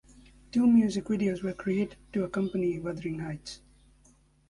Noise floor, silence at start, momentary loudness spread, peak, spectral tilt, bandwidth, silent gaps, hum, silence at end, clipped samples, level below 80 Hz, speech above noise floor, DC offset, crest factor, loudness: -62 dBFS; 0.55 s; 15 LU; -14 dBFS; -7 dB/octave; 11 kHz; none; none; 0.95 s; under 0.1%; -58 dBFS; 34 dB; under 0.1%; 16 dB; -29 LUFS